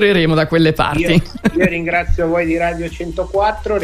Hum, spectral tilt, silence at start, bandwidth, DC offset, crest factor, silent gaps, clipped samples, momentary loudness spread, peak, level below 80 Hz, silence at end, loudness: none; -6.5 dB/octave; 0 s; 15 kHz; under 0.1%; 14 dB; none; under 0.1%; 7 LU; -2 dBFS; -28 dBFS; 0 s; -16 LUFS